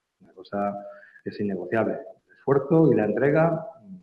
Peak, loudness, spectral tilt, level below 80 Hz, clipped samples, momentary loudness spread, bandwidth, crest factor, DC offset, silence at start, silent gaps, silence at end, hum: -8 dBFS; -24 LUFS; -10.5 dB/octave; -64 dBFS; under 0.1%; 19 LU; 5.2 kHz; 18 dB; under 0.1%; 0.35 s; none; 0.05 s; none